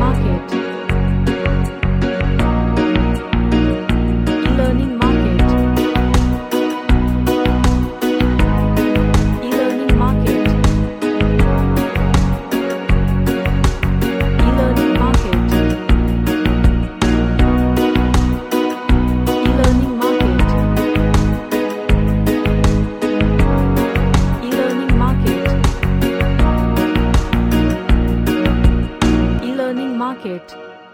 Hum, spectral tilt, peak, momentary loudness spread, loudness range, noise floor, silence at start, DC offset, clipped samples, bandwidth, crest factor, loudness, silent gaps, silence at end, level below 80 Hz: none; -7 dB/octave; 0 dBFS; 4 LU; 1 LU; -35 dBFS; 0 s; under 0.1%; under 0.1%; 17 kHz; 14 dB; -16 LUFS; none; 0.1 s; -18 dBFS